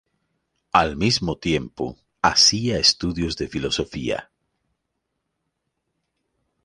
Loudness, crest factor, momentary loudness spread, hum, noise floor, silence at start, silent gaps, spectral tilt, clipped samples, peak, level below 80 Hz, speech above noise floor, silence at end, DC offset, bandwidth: -20 LUFS; 22 dB; 14 LU; none; -78 dBFS; 0.75 s; none; -3 dB/octave; under 0.1%; -2 dBFS; -44 dBFS; 56 dB; 2.4 s; under 0.1%; 11.5 kHz